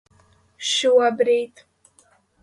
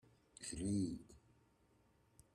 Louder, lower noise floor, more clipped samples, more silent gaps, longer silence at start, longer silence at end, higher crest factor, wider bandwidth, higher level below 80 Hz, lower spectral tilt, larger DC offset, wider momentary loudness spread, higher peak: first, -19 LUFS vs -44 LUFS; second, -59 dBFS vs -74 dBFS; neither; neither; first, 0.6 s vs 0.4 s; second, 0.95 s vs 1.15 s; about the same, 16 dB vs 18 dB; second, 11.5 kHz vs 13.5 kHz; about the same, -70 dBFS vs -66 dBFS; second, -1.5 dB/octave vs -5.5 dB/octave; neither; about the same, 12 LU vs 14 LU; first, -6 dBFS vs -30 dBFS